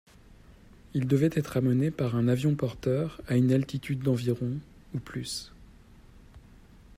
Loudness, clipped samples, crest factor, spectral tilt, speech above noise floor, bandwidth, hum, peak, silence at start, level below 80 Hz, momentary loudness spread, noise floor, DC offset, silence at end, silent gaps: -29 LUFS; under 0.1%; 18 dB; -7.5 dB/octave; 26 dB; 15 kHz; none; -12 dBFS; 0.3 s; -54 dBFS; 12 LU; -53 dBFS; under 0.1%; 0.6 s; none